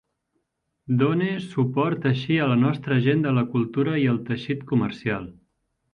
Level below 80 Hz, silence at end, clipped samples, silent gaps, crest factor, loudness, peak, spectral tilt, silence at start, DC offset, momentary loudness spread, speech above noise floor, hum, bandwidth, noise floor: -60 dBFS; 0.6 s; under 0.1%; none; 16 dB; -23 LUFS; -8 dBFS; -9 dB/octave; 0.9 s; under 0.1%; 7 LU; 53 dB; none; 6.4 kHz; -76 dBFS